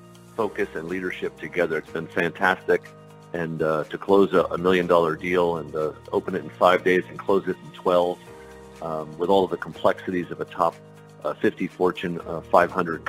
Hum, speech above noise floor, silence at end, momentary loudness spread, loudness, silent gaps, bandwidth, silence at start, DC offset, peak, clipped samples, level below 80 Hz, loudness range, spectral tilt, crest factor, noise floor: none; 20 dB; 0 s; 12 LU; -24 LUFS; none; 16 kHz; 0 s; under 0.1%; -2 dBFS; under 0.1%; -56 dBFS; 4 LU; -6.5 dB/octave; 22 dB; -43 dBFS